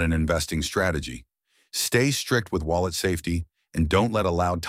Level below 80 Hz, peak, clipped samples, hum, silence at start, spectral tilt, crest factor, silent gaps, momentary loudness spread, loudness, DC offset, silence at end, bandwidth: -38 dBFS; -8 dBFS; under 0.1%; none; 0 s; -4.5 dB/octave; 18 dB; none; 10 LU; -25 LUFS; under 0.1%; 0 s; 16 kHz